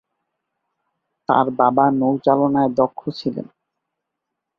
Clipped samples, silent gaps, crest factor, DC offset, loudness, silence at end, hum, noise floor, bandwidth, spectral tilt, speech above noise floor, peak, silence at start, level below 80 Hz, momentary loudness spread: under 0.1%; none; 20 dB; under 0.1%; -18 LUFS; 1.15 s; none; -81 dBFS; 6 kHz; -9 dB/octave; 63 dB; -2 dBFS; 1.3 s; -62 dBFS; 11 LU